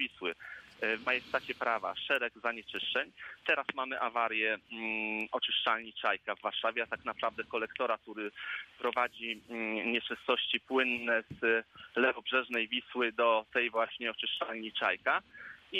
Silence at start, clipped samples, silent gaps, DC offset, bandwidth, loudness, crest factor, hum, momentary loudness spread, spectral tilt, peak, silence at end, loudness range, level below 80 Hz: 0 s; under 0.1%; none; under 0.1%; 14 kHz; -33 LUFS; 20 dB; none; 8 LU; -4 dB/octave; -14 dBFS; 0 s; 4 LU; -74 dBFS